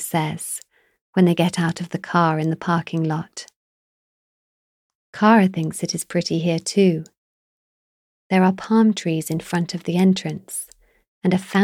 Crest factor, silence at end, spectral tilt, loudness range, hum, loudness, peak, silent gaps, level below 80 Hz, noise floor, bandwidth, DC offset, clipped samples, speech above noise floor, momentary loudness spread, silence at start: 18 dB; 0 s; -5.5 dB/octave; 3 LU; none; -21 LUFS; -4 dBFS; 1.01-1.13 s, 3.56-5.13 s, 7.18-8.30 s, 11.08-11.21 s; -66 dBFS; under -90 dBFS; 16 kHz; under 0.1%; under 0.1%; over 71 dB; 12 LU; 0 s